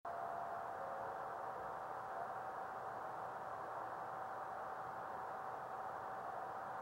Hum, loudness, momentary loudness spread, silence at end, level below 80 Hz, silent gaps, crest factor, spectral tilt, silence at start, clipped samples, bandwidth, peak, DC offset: none; -47 LUFS; 1 LU; 0 s; -78 dBFS; none; 12 dB; -5 dB/octave; 0.05 s; under 0.1%; 16.5 kHz; -34 dBFS; under 0.1%